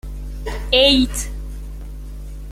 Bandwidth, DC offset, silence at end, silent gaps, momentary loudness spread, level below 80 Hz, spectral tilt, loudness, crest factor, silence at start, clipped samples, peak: 16 kHz; under 0.1%; 0 s; none; 22 LU; -28 dBFS; -3.5 dB/octave; -16 LUFS; 20 dB; 0.05 s; under 0.1%; -2 dBFS